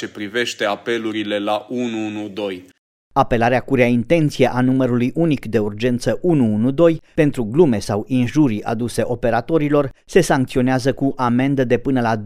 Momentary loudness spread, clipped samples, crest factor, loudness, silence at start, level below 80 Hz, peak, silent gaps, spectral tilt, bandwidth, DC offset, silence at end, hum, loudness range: 7 LU; under 0.1%; 18 dB; -18 LUFS; 0 s; -40 dBFS; 0 dBFS; 2.78-3.11 s; -6.5 dB/octave; 15 kHz; under 0.1%; 0 s; none; 3 LU